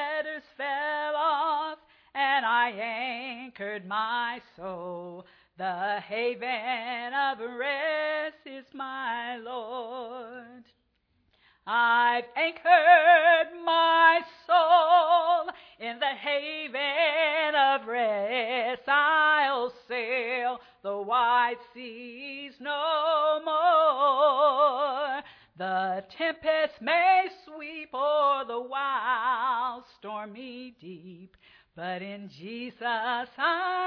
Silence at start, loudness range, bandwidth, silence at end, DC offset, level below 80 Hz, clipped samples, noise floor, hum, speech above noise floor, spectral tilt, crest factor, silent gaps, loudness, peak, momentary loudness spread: 0 s; 12 LU; 5.4 kHz; 0 s; under 0.1%; -76 dBFS; under 0.1%; -72 dBFS; none; 46 dB; -5.5 dB/octave; 20 dB; none; -26 LUFS; -6 dBFS; 18 LU